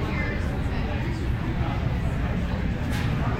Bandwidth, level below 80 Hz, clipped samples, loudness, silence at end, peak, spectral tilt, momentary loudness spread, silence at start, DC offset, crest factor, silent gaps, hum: 14 kHz; -30 dBFS; under 0.1%; -27 LUFS; 0 s; -14 dBFS; -7.5 dB/octave; 2 LU; 0 s; under 0.1%; 12 dB; none; none